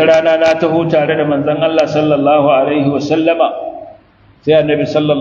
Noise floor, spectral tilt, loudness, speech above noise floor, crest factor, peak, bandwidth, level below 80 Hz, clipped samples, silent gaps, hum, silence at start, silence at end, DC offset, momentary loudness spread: -45 dBFS; -6.5 dB/octave; -12 LUFS; 34 dB; 12 dB; 0 dBFS; 7.4 kHz; -52 dBFS; under 0.1%; none; none; 0 s; 0 s; under 0.1%; 5 LU